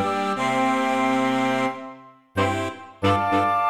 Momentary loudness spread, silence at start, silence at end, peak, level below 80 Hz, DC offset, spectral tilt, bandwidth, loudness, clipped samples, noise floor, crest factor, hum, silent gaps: 10 LU; 0 s; 0 s; -8 dBFS; -62 dBFS; 0.2%; -5.5 dB/octave; 14.5 kHz; -23 LUFS; under 0.1%; -43 dBFS; 14 dB; none; none